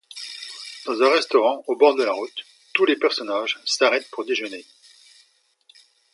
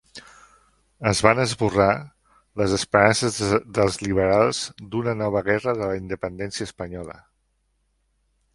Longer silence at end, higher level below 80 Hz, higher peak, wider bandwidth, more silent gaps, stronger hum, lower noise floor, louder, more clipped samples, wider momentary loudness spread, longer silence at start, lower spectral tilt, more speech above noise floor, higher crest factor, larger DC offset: about the same, 1.5 s vs 1.45 s; second, -82 dBFS vs -48 dBFS; about the same, -2 dBFS vs 0 dBFS; about the same, 11.5 kHz vs 11.5 kHz; neither; neither; second, -61 dBFS vs -69 dBFS; about the same, -21 LUFS vs -22 LUFS; neither; first, 16 LU vs 13 LU; about the same, 0.15 s vs 0.15 s; second, -1.5 dB/octave vs -4.5 dB/octave; second, 40 dB vs 48 dB; about the same, 22 dB vs 22 dB; neither